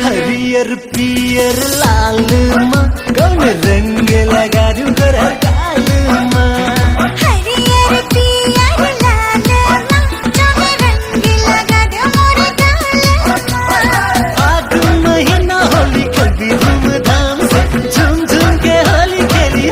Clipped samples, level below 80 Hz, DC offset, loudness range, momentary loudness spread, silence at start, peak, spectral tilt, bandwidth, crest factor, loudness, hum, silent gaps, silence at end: under 0.1%; -18 dBFS; under 0.1%; 1 LU; 3 LU; 0 s; 0 dBFS; -5 dB/octave; 16.5 kHz; 10 dB; -11 LUFS; none; none; 0 s